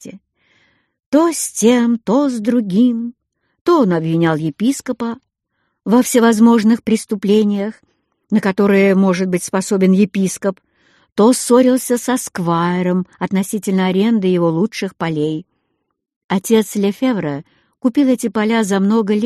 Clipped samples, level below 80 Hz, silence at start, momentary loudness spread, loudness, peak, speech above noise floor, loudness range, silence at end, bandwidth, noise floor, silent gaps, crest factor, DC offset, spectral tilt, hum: under 0.1%; -60 dBFS; 0.05 s; 10 LU; -15 LUFS; -2 dBFS; 55 dB; 4 LU; 0 s; 13 kHz; -70 dBFS; 1.06-1.12 s, 3.61-3.65 s, 16.16-16.29 s; 14 dB; under 0.1%; -5.5 dB/octave; none